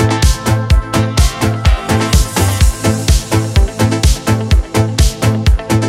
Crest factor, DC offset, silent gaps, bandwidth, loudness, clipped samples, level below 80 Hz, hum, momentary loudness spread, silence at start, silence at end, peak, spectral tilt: 12 dB; under 0.1%; none; 16 kHz; -13 LUFS; under 0.1%; -16 dBFS; none; 2 LU; 0 s; 0 s; 0 dBFS; -5 dB/octave